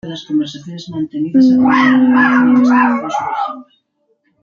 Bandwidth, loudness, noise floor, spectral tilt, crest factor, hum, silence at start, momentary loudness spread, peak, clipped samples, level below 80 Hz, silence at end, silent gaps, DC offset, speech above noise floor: 7 kHz; -12 LUFS; -63 dBFS; -6 dB/octave; 12 dB; none; 0.05 s; 14 LU; 0 dBFS; under 0.1%; -58 dBFS; 0.8 s; none; under 0.1%; 50 dB